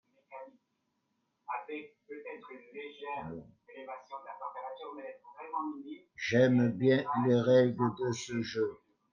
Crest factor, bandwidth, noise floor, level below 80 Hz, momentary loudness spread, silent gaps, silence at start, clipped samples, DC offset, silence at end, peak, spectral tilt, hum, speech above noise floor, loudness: 20 dB; 7.4 kHz; -80 dBFS; -76 dBFS; 23 LU; none; 0.3 s; under 0.1%; under 0.1%; 0.35 s; -12 dBFS; -6.5 dB/octave; none; 48 dB; -31 LUFS